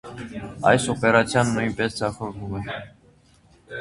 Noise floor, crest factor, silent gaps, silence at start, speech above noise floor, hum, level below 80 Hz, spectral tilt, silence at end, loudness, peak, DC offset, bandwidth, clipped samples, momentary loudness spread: -56 dBFS; 22 dB; none; 0.05 s; 33 dB; none; -50 dBFS; -5 dB/octave; 0 s; -22 LUFS; -2 dBFS; under 0.1%; 11.5 kHz; under 0.1%; 17 LU